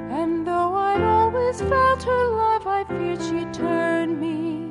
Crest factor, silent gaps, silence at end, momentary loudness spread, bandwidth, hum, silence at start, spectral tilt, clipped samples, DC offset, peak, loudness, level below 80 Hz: 12 dB; none; 0 s; 7 LU; 11.5 kHz; none; 0 s; -6.5 dB/octave; under 0.1%; under 0.1%; -10 dBFS; -22 LUFS; -42 dBFS